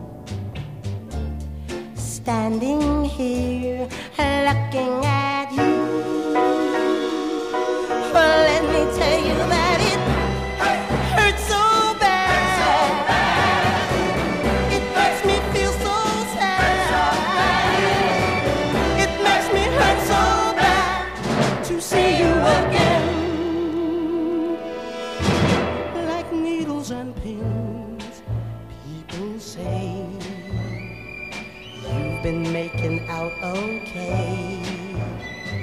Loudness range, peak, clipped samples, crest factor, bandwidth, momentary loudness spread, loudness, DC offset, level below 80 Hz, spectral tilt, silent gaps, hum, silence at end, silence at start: 10 LU; -4 dBFS; under 0.1%; 16 dB; 15.5 kHz; 14 LU; -20 LUFS; 0.2%; -34 dBFS; -5 dB/octave; none; none; 0 s; 0 s